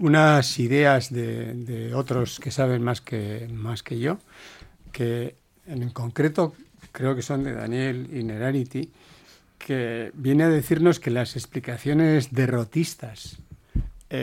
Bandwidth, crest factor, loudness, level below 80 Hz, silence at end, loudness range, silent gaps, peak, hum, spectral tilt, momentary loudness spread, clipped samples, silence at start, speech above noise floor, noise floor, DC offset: 16.5 kHz; 20 dB; -24 LUFS; -46 dBFS; 0 s; 6 LU; none; -4 dBFS; none; -6.5 dB/octave; 14 LU; under 0.1%; 0 s; 30 dB; -53 dBFS; under 0.1%